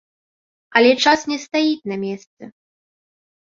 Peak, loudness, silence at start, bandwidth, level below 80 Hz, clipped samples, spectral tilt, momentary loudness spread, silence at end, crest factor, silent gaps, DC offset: 0 dBFS; -18 LUFS; 0.75 s; 7.8 kHz; -64 dBFS; under 0.1%; -3.5 dB/octave; 14 LU; 0.95 s; 20 dB; 2.27-2.37 s; under 0.1%